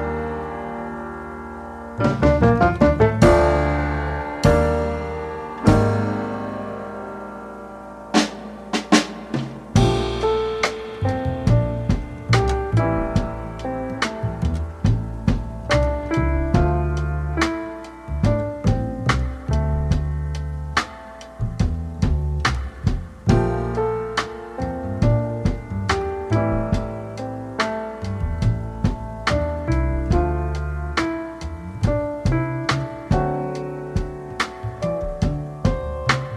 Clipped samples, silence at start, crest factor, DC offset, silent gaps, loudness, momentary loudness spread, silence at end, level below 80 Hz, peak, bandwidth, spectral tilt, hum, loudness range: under 0.1%; 0 s; 20 dB; under 0.1%; none; -22 LUFS; 12 LU; 0 s; -28 dBFS; -2 dBFS; 12.5 kHz; -6.5 dB/octave; none; 6 LU